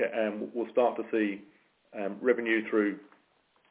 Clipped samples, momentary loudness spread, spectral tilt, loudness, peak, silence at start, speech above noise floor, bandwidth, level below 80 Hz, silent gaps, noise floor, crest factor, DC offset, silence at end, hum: under 0.1%; 13 LU; -9 dB/octave; -30 LUFS; -12 dBFS; 0 s; 39 dB; 4 kHz; -84 dBFS; none; -69 dBFS; 18 dB; under 0.1%; 0.65 s; none